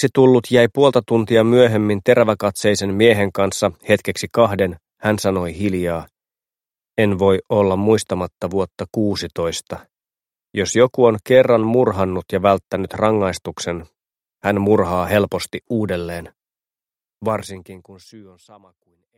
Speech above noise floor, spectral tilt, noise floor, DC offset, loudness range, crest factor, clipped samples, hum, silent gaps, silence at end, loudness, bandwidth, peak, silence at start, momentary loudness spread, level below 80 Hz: over 73 dB; -5.5 dB/octave; under -90 dBFS; under 0.1%; 6 LU; 18 dB; under 0.1%; none; none; 0.95 s; -18 LUFS; 16 kHz; 0 dBFS; 0 s; 12 LU; -50 dBFS